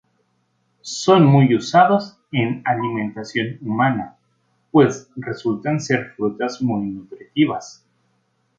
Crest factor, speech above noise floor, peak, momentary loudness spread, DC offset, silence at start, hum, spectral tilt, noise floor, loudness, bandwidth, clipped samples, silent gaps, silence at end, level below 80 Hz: 18 dB; 48 dB; -2 dBFS; 16 LU; under 0.1%; 0.85 s; none; -6.5 dB/octave; -67 dBFS; -19 LUFS; 7.8 kHz; under 0.1%; none; 0.85 s; -60 dBFS